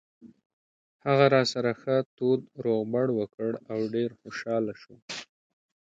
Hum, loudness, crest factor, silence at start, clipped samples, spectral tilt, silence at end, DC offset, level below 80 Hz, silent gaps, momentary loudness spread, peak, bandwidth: none; -27 LUFS; 22 dB; 0.25 s; under 0.1%; -6 dB/octave; 0.7 s; under 0.1%; -72 dBFS; 0.46-0.99 s, 2.06-2.17 s, 3.34-3.38 s, 5.02-5.08 s; 16 LU; -6 dBFS; 9 kHz